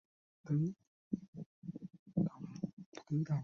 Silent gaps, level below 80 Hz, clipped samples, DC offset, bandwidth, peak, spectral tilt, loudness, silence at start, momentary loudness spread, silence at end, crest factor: 0.87-1.11 s, 1.28-1.33 s, 1.46-1.62 s, 1.99-2.06 s, 2.73-2.77 s, 2.86-2.92 s; -72 dBFS; under 0.1%; under 0.1%; 6.8 kHz; -24 dBFS; -10 dB/octave; -41 LUFS; 0.45 s; 16 LU; 0 s; 18 dB